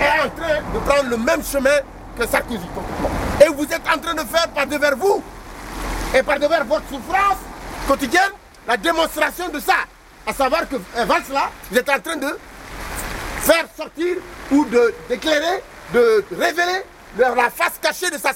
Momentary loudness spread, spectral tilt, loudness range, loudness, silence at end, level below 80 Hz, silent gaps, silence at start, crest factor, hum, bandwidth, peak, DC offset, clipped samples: 11 LU; -3.5 dB/octave; 2 LU; -19 LUFS; 0 s; -38 dBFS; none; 0 s; 20 dB; none; 16.5 kHz; 0 dBFS; under 0.1%; under 0.1%